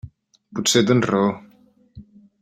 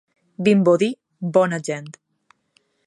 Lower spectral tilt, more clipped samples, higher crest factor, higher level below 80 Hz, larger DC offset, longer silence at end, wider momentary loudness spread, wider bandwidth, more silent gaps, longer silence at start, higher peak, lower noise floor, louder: second, -4 dB/octave vs -6.5 dB/octave; neither; about the same, 20 dB vs 18 dB; first, -56 dBFS vs -68 dBFS; neither; second, 0.4 s vs 0.95 s; about the same, 16 LU vs 14 LU; first, 16 kHz vs 11.5 kHz; neither; second, 0.05 s vs 0.4 s; about the same, -2 dBFS vs -2 dBFS; second, -55 dBFS vs -65 dBFS; about the same, -19 LUFS vs -20 LUFS